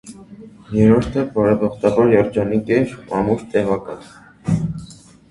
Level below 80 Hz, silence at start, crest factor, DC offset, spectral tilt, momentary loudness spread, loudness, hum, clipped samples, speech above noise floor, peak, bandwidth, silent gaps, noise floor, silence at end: -44 dBFS; 0.05 s; 18 dB; under 0.1%; -8 dB/octave; 15 LU; -18 LUFS; none; under 0.1%; 24 dB; 0 dBFS; 11.5 kHz; none; -41 dBFS; 0.35 s